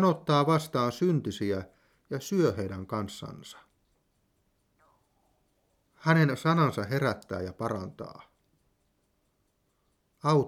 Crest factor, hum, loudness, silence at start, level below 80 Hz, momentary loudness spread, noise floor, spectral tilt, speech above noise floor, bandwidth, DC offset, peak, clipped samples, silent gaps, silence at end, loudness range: 20 dB; none; -29 LUFS; 0 s; -66 dBFS; 17 LU; -74 dBFS; -6.5 dB/octave; 46 dB; 15.5 kHz; under 0.1%; -10 dBFS; under 0.1%; none; 0 s; 11 LU